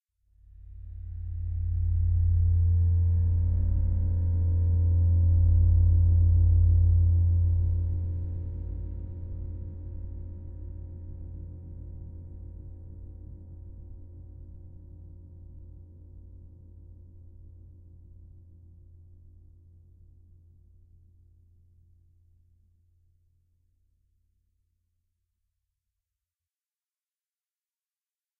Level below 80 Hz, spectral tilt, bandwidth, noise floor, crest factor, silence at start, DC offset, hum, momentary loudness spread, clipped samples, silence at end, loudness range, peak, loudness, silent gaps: -34 dBFS; -13.5 dB/octave; 1 kHz; under -90 dBFS; 16 dB; 0.6 s; under 0.1%; none; 26 LU; under 0.1%; 10.95 s; 25 LU; -14 dBFS; -26 LUFS; none